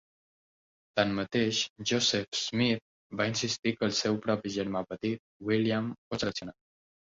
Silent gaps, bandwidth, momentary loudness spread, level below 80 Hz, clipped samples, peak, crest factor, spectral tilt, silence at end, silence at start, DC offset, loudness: 1.70-1.76 s, 2.28-2.32 s, 2.81-3.10 s, 3.59-3.63 s, 5.19-5.40 s, 5.98-6.11 s; 7.8 kHz; 8 LU; -64 dBFS; under 0.1%; -12 dBFS; 20 dB; -4 dB/octave; 0.6 s; 0.95 s; under 0.1%; -30 LUFS